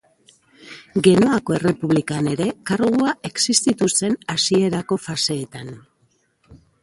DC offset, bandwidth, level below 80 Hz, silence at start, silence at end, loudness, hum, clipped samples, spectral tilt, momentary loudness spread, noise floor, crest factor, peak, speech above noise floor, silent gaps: under 0.1%; 11.5 kHz; -56 dBFS; 0.65 s; 0.25 s; -19 LUFS; none; under 0.1%; -4 dB/octave; 11 LU; -64 dBFS; 20 dB; 0 dBFS; 44 dB; none